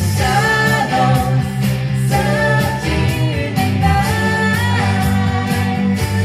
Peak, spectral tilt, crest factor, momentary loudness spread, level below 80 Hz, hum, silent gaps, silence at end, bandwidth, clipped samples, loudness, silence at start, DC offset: -2 dBFS; -5.5 dB/octave; 12 dB; 4 LU; -32 dBFS; none; none; 0 s; 15.5 kHz; under 0.1%; -15 LUFS; 0 s; under 0.1%